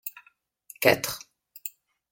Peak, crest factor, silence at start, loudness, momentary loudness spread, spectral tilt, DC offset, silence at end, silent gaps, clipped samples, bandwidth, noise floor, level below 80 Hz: -4 dBFS; 28 dB; 0.05 s; -24 LUFS; 17 LU; -3 dB/octave; under 0.1%; 0.4 s; none; under 0.1%; 17 kHz; -64 dBFS; -66 dBFS